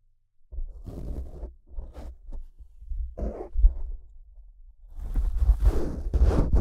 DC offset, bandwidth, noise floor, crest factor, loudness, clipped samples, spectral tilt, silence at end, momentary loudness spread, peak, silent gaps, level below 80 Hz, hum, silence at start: under 0.1%; 6.2 kHz; -59 dBFS; 20 dB; -29 LUFS; under 0.1%; -9 dB/octave; 0 s; 21 LU; -6 dBFS; none; -28 dBFS; none; 0.5 s